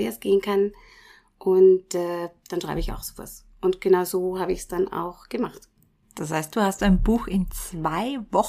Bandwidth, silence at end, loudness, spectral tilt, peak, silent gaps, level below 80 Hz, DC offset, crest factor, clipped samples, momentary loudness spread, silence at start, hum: 15.5 kHz; 0 s; -24 LUFS; -6 dB/octave; -8 dBFS; none; -38 dBFS; under 0.1%; 16 dB; under 0.1%; 13 LU; 0 s; none